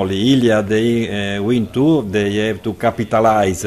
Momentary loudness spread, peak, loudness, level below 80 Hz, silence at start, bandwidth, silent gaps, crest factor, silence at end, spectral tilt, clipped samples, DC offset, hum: 6 LU; -2 dBFS; -16 LUFS; -44 dBFS; 0 s; 14.5 kHz; none; 14 dB; 0 s; -6 dB/octave; under 0.1%; under 0.1%; none